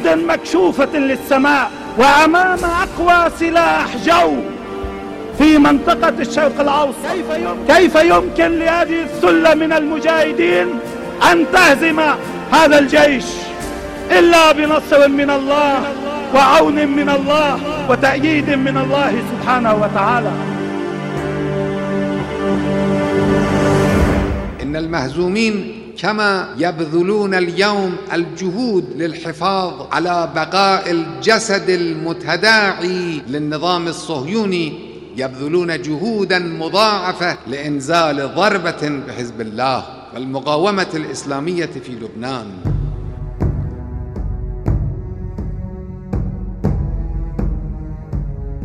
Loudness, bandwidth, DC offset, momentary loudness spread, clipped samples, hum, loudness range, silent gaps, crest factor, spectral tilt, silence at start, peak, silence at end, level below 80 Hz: -15 LUFS; 16 kHz; under 0.1%; 15 LU; under 0.1%; none; 11 LU; none; 16 dB; -5 dB/octave; 0 s; 0 dBFS; 0 s; -32 dBFS